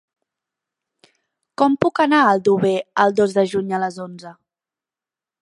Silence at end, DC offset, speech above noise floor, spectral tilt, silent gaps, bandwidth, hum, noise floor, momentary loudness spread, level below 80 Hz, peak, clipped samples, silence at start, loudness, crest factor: 1.1 s; under 0.1%; 72 dB; -6 dB/octave; none; 11.5 kHz; none; -90 dBFS; 18 LU; -62 dBFS; 0 dBFS; under 0.1%; 1.6 s; -18 LUFS; 20 dB